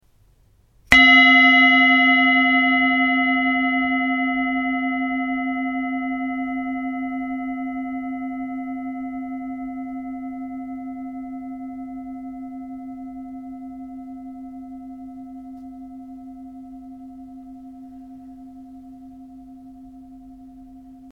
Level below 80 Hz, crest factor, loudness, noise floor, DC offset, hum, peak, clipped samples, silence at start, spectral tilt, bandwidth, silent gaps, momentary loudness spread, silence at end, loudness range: -52 dBFS; 22 dB; -17 LUFS; -57 dBFS; under 0.1%; none; 0 dBFS; under 0.1%; 0.9 s; -3.5 dB/octave; 9.6 kHz; none; 27 LU; 0 s; 27 LU